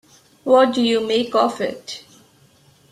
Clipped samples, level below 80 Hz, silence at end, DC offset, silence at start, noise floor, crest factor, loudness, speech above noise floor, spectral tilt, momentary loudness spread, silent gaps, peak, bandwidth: under 0.1%; -64 dBFS; 0.95 s; under 0.1%; 0.45 s; -54 dBFS; 18 dB; -18 LUFS; 36 dB; -4 dB/octave; 18 LU; none; -2 dBFS; 13.5 kHz